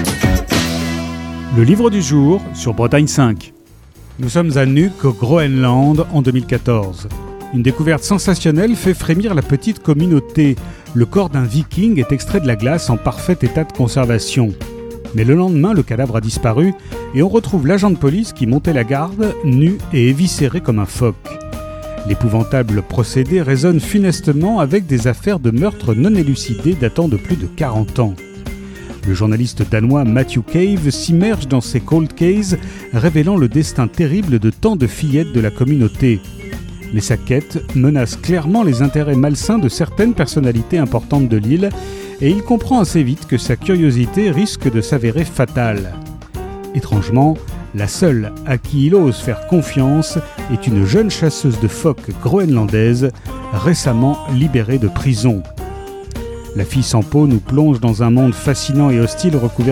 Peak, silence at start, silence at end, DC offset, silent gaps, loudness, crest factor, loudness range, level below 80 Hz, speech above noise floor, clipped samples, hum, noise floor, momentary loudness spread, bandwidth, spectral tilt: 0 dBFS; 0 s; 0 s; under 0.1%; none; -15 LUFS; 14 dB; 2 LU; -32 dBFS; 27 dB; under 0.1%; none; -41 dBFS; 9 LU; 16.5 kHz; -6.5 dB/octave